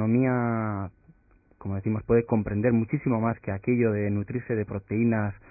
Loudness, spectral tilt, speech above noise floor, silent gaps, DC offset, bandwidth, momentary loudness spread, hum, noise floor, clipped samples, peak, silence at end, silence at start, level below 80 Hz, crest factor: -27 LUFS; -15.5 dB/octave; 35 dB; none; under 0.1%; 2.7 kHz; 8 LU; none; -60 dBFS; under 0.1%; -10 dBFS; 0.15 s; 0 s; -50 dBFS; 16 dB